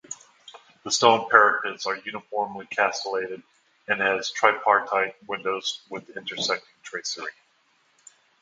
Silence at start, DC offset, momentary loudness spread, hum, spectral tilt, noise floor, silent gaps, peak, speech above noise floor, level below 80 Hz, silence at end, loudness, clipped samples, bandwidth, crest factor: 0.1 s; under 0.1%; 19 LU; none; -1.5 dB/octave; -65 dBFS; none; 0 dBFS; 41 dB; -74 dBFS; 1.1 s; -24 LUFS; under 0.1%; 9.6 kHz; 26 dB